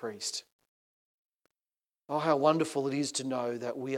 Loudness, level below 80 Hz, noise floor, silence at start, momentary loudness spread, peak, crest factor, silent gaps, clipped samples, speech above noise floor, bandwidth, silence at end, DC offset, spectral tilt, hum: -31 LUFS; -88 dBFS; under -90 dBFS; 0 s; 10 LU; -12 dBFS; 22 dB; 0.52-0.59 s, 0.68-1.39 s; under 0.1%; over 59 dB; 15.5 kHz; 0 s; under 0.1%; -4.5 dB/octave; none